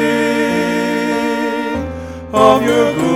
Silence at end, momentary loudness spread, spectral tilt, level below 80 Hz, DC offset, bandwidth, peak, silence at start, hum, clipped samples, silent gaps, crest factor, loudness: 0 s; 11 LU; -5 dB/octave; -44 dBFS; 0.1%; 16.5 kHz; 0 dBFS; 0 s; none; under 0.1%; none; 14 dB; -15 LUFS